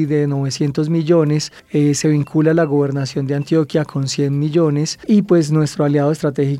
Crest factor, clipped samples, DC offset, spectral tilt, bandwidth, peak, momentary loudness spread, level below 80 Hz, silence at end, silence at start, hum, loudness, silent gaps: 14 dB; under 0.1%; under 0.1%; -6.5 dB/octave; 12 kHz; -2 dBFS; 6 LU; -56 dBFS; 0 s; 0 s; none; -17 LUFS; none